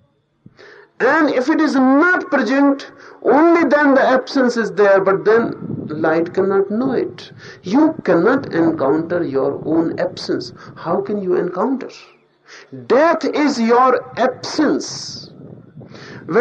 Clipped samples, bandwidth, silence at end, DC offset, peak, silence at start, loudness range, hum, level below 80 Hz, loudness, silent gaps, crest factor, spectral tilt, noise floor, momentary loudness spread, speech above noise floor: under 0.1%; 8.6 kHz; 0 s; under 0.1%; -4 dBFS; 1 s; 6 LU; none; -62 dBFS; -16 LUFS; none; 14 dB; -5.5 dB/octave; -50 dBFS; 16 LU; 34 dB